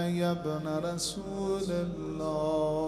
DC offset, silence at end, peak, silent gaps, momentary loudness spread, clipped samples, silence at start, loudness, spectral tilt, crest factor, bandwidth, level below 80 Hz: under 0.1%; 0 s; -16 dBFS; none; 5 LU; under 0.1%; 0 s; -32 LUFS; -5.5 dB/octave; 14 dB; 14.5 kHz; -54 dBFS